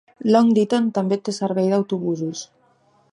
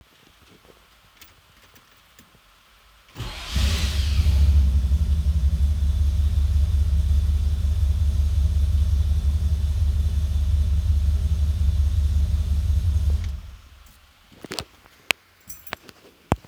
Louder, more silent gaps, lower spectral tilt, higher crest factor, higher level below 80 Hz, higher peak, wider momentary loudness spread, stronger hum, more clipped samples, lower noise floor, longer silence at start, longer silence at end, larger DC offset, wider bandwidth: first, -20 LUFS vs -23 LUFS; neither; about the same, -6.5 dB/octave vs -5.5 dB/octave; about the same, 18 dB vs 22 dB; second, -70 dBFS vs -22 dBFS; about the same, -2 dBFS vs 0 dBFS; about the same, 10 LU vs 12 LU; neither; neither; first, -59 dBFS vs -55 dBFS; second, 0.2 s vs 3.15 s; first, 0.65 s vs 0.1 s; neither; second, 10.5 kHz vs over 20 kHz